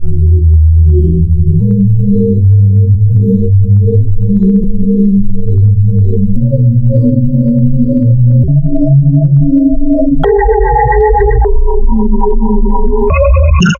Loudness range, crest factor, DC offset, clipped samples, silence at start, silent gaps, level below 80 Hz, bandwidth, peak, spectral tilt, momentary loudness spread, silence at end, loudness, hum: 2 LU; 6 dB; under 0.1%; 0.3%; 0 s; none; -12 dBFS; 7 kHz; 0 dBFS; -9.5 dB/octave; 5 LU; 0 s; -9 LUFS; none